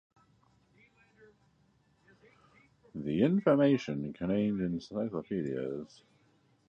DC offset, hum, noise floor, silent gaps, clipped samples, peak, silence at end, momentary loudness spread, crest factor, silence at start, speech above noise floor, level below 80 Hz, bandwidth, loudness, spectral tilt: under 0.1%; none; -69 dBFS; none; under 0.1%; -14 dBFS; 0.85 s; 15 LU; 20 dB; 2.95 s; 38 dB; -66 dBFS; 7.4 kHz; -32 LUFS; -8 dB/octave